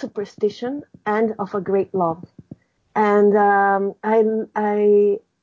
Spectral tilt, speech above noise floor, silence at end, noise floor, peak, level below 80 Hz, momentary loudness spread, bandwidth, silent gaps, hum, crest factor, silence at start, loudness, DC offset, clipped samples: -8 dB/octave; 26 dB; 0.25 s; -45 dBFS; -6 dBFS; -64 dBFS; 13 LU; 6.8 kHz; none; none; 12 dB; 0 s; -19 LUFS; under 0.1%; under 0.1%